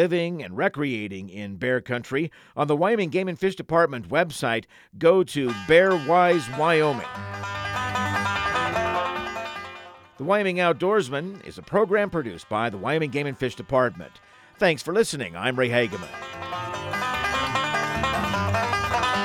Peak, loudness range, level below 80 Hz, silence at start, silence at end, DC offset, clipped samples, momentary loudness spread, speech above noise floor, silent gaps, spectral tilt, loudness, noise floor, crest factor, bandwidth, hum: -4 dBFS; 4 LU; -52 dBFS; 0 s; 0 s; under 0.1%; under 0.1%; 12 LU; 20 dB; none; -5 dB/octave; -24 LUFS; -44 dBFS; 20 dB; 16 kHz; none